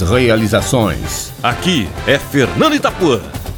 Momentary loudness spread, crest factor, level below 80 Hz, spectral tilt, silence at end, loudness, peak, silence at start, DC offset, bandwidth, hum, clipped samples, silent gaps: 6 LU; 14 dB; -32 dBFS; -5 dB/octave; 0 s; -14 LUFS; 0 dBFS; 0 s; under 0.1%; 19.5 kHz; none; under 0.1%; none